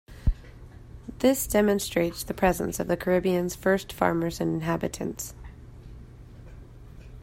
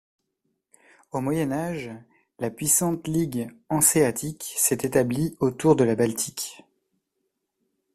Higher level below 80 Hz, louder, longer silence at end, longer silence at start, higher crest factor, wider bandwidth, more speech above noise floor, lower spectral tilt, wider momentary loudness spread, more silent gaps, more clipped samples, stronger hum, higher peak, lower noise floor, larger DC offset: first, -40 dBFS vs -56 dBFS; about the same, -26 LUFS vs -24 LUFS; second, 0 s vs 1.4 s; second, 0.1 s vs 1.15 s; about the same, 20 dB vs 22 dB; about the same, 16.5 kHz vs 16 kHz; second, 20 dB vs 54 dB; about the same, -5 dB/octave vs -4.5 dB/octave; first, 24 LU vs 13 LU; neither; neither; neither; about the same, -6 dBFS vs -4 dBFS; second, -46 dBFS vs -78 dBFS; neither